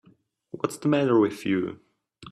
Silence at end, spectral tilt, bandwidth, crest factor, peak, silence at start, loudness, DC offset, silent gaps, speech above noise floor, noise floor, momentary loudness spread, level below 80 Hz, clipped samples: 0 s; -6.5 dB/octave; 14.5 kHz; 18 dB; -8 dBFS; 0.55 s; -25 LUFS; under 0.1%; none; 37 dB; -61 dBFS; 13 LU; -68 dBFS; under 0.1%